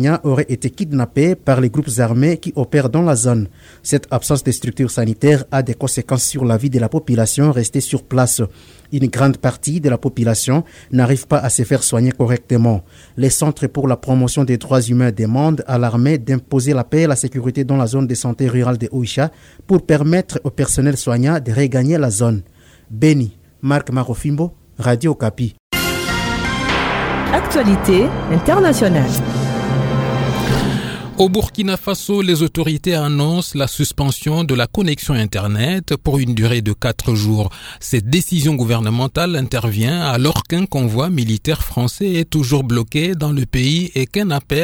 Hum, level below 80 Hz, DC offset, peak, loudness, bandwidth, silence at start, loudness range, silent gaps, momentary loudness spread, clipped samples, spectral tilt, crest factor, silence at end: none; -36 dBFS; under 0.1%; 0 dBFS; -16 LUFS; 18.5 kHz; 0 s; 2 LU; 25.60-25.70 s; 5 LU; under 0.1%; -5.5 dB/octave; 16 dB; 0 s